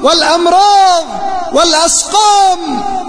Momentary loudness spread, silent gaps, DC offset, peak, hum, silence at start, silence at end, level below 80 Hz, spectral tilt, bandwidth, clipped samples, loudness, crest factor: 9 LU; none; under 0.1%; 0 dBFS; none; 0 s; 0 s; -38 dBFS; -0.5 dB/octave; 11 kHz; under 0.1%; -9 LUFS; 10 dB